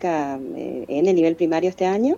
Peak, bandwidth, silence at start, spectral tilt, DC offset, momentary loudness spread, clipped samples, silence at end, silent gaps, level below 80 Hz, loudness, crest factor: -8 dBFS; 7.4 kHz; 0 s; -7 dB/octave; under 0.1%; 12 LU; under 0.1%; 0 s; none; -60 dBFS; -21 LUFS; 12 dB